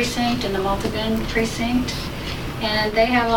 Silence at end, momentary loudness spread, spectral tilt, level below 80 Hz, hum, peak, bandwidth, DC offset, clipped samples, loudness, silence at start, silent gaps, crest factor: 0 s; 9 LU; -4.5 dB/octave; -34 dBFS; none; -6 dBFS; 19 kHz; under 0.1%; under 0.1%; -22 LUFS; 0 s; none; 16 dB